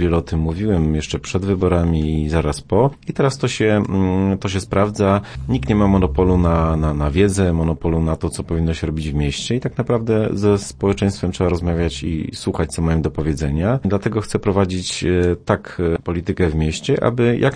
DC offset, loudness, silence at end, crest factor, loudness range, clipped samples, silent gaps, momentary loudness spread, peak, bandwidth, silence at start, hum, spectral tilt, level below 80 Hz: under 0.1%; -19 LUFS; 0 s; 16 dB; 3 LU; under 0.1%; none; 6 LU; -2 dBFS; 10.5 kHz; 0 s; none; -6.5 dB/octave; -30 dBFS